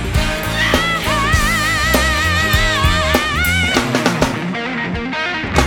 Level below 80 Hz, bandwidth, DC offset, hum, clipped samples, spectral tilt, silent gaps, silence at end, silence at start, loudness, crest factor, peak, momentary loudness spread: -24 dBFS; over 20 kHz; under 0.1%; none; under 0.1%; -4 dB/octave; none; 0 s; 0 s; -15 LUFS; 14 dB; -2 dBFS; 7 LU